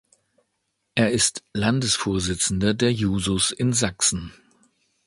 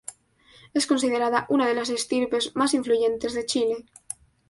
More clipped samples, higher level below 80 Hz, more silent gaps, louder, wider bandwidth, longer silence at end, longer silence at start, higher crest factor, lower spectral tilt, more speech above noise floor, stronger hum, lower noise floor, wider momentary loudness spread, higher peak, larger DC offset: neither; first, -44 dBFS vs -62 dBFS; neither; about the same, -22 LUFS vs -24 LUFS; about the same, 11.5 kHz vs 11.5 kHz; about the same, 0.75 s vs 0.7 s; first, 0.95 s vs 0.1 s; about the same, 20 dB vs 16 dB; about the same, -3.5 dB/octave vs -2.5 dB/octave; first, 53 dB vs 33 dB; neither; first, -75 dBFS vs -56 dBFS; second, 5 LU vs 13 LU; first, -4 dBFS vs -10 dBFS; neither